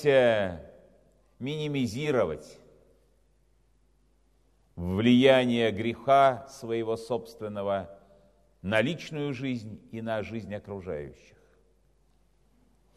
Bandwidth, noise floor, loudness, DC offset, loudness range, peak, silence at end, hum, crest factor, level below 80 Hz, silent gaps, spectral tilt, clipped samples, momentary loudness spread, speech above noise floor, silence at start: 13.5 kHz; -66 dBFS; -28 LUFS; under 0.1%; 11 LU; -6 dBFS; 1.85 s; none; 22 dB; -60 dBFS; none; -6.5 dB/octave; under 0.1%; 17 LU; 39 dB; 0 s